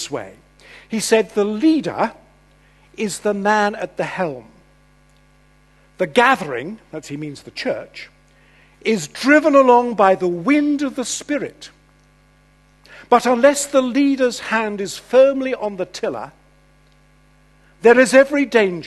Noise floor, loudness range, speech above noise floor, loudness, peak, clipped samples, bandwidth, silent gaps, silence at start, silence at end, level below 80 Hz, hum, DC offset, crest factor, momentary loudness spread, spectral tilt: -53 dBFS; 6 LU; 36 dB; -17 LUFS; 0 dBFS; under 0.1%; 12.5 kHz; none; 0 s; 0 s; -56 dBFS; 50 Hz at -55 dBFS; under 0.1%; 18 dB; 17 LU; -4 dB/octave